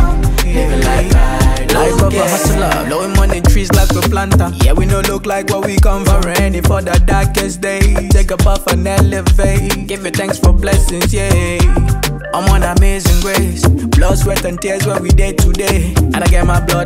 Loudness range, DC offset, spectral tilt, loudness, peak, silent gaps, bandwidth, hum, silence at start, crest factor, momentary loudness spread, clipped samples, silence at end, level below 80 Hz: 1 LU; under 0.1%; -5 dB/octave; -13 LUFS; 0 dBFS; none; 16.5 kHz; none; 0 s; 10 dB; 4 LU; under 0.1%; 0 s; -14 dBFS